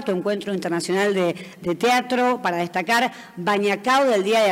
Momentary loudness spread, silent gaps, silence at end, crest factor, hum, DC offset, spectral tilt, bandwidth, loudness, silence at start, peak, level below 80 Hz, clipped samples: 7 LU; none; 0 s; 14 dB; none; under 0.1%; -4.5 dB/octave; 16 kHz; -21 LUFS; 0 s; -8 dBFS; -66 dBFS; under 0.1%